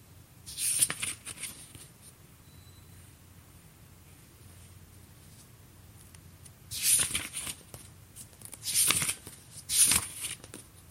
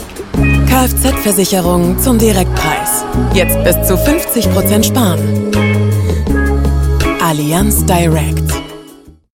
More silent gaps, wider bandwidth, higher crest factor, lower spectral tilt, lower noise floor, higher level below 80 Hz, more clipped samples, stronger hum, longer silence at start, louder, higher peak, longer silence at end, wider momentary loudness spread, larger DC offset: neither; about the same, 16 kHz vs 17 kHz; first, 30 dB vs 12 dB; second, 0 dB/octave vs -5 dB/octave; first, -55 dBFS vs -38 dBFS; second, -60 dBFS vs -18 dBFS; neither; neither; about the same, 0.1 s vs 0 s; second, -28 LUFS vs -12 LUFS; second, -6 dBFS vs 0 dBFS; second, 0.05 s vs 0.5 s; first, 26 LU vs 4 LU; neither